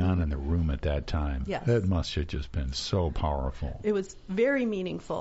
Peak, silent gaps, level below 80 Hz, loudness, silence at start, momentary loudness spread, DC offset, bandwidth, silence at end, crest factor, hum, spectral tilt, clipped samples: -14 dBFS; none; -36 dBFS; -30 LUFS; 0 s; 7 LU; under 0.1%; 8 kHz; 0 s; 16 dB; none; -6 dB/octave; under 0.1%